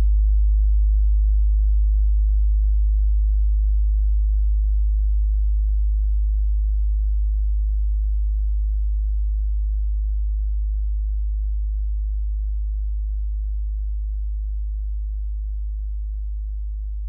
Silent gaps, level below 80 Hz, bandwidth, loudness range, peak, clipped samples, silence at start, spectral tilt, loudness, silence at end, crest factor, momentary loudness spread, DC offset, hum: none; -20 dBFS; 0.2 kHz; 7 LU; -12 dBFS; under 0.1%; 0 s; -26.5 dB/octave; -24 LUFS; 0 s; 8 dB; 9 LU; under 0.1%; none